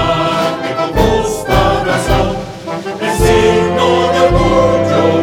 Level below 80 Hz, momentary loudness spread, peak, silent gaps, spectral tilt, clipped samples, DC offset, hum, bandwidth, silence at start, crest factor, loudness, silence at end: -24 dBFS; 8 LU; 0 dBFS; none; -5.5 dB/octave; under 0.1%; under 0.1%; none; 18.5 kHz; 0 s; 12 dB; -12 LUFS; 0 s